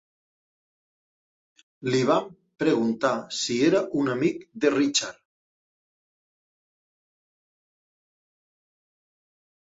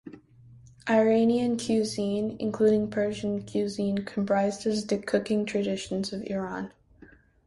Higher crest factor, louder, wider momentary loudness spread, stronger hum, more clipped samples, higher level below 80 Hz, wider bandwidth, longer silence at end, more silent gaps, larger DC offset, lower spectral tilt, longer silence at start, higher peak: first, 22 dB vs 16 dB; first, -24 LUFS vs -27 LUFS; second, 6 LU vs 9 LU; neither; neither; second, -70 dBFS vs -60 dBFS; second, 8 kHz vs 11.5 kHz; first, 4.5 s vs 0.8 s; neither; neither; second, -4 dB/octave vs -5.5 dB/octave; first, 1.8 s vs 0.05 s; first, -8 dBFS vs -12 dBFS